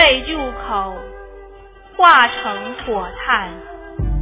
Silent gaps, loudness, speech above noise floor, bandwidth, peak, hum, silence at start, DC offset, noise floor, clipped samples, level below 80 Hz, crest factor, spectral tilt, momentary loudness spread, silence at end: none; -16 LUFS; 25 dB; 4 kHz; 0 dBFS; none; 0 s; under 0.1%; -41 dBFS; 0.1%; -32 dBFS; 18 dB; -7.5 dB/octave; 23 LU; 0 s